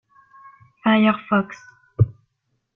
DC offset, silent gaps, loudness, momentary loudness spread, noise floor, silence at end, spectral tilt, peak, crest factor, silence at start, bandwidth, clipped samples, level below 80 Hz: under 0.1%; none; -20 LUFS; 18 LU; -73 dBFS; 0.65 s; -8.5 dB/octave; -4 dBFS; 18 dB; 0.85 s; 6.4 kHz; under 0.1%; -52 dBFS